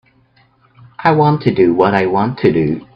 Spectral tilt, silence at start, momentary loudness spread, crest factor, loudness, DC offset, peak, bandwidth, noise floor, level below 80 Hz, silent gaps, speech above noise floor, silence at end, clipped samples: -9.5 dB/octave; 1 s; 4 LU; 14 dB; -13 LUFS; under 0.1%; 0 dBFS; 5.8 kHz; -53 dBFS; -48 dBFS; none; 41 dB; 0.15 s; under 0.1%